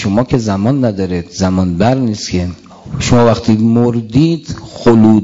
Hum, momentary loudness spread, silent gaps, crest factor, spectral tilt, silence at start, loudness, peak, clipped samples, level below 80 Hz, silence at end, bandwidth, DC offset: none; 10 LU; none; 12 dB; -7 dB/octave; 0 s; -13 LUFS; 0 dBFS; under 0.1%; -38 dBFS; 0 s; 7.8 kHz; under 0.1%